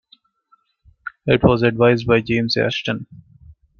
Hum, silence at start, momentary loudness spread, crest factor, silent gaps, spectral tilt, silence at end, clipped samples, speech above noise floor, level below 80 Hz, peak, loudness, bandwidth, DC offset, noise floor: none; 1.05 s; 14 LU; 18 dB; none; -7 dB/octave; 0.6 s; under 0.1%; 43 dB; -44 dBFS; 0 dBFS; -18 LUFS; 7 kHz; under 0.1%; -60 dBFS